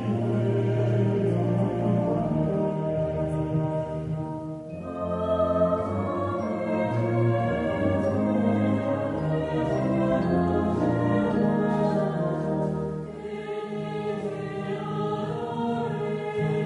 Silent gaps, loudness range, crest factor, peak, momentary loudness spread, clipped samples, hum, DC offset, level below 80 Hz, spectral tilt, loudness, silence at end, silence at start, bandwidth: none; 5 LU; 14 dB; -12 dBFS; 8 LU; under 0.1%; none; under 0.1%; -50 dBFS; -9 dB/octave; -26 LUFS; 0 s; 0 s; 10.5 kHz